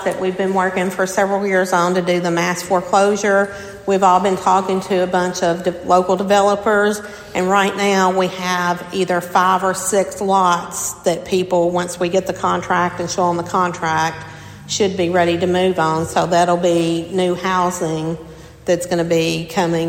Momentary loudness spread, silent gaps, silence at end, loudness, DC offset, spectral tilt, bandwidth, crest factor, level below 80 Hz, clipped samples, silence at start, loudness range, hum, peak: 6 LU; none; 0 s; -17 LUFS; under 0.1%; -4.5 dB/octave; 16.5 kHz; 16 dB; -50 dBFS; under 0.1%; 0 s; 2 LU; none; -2 dBFS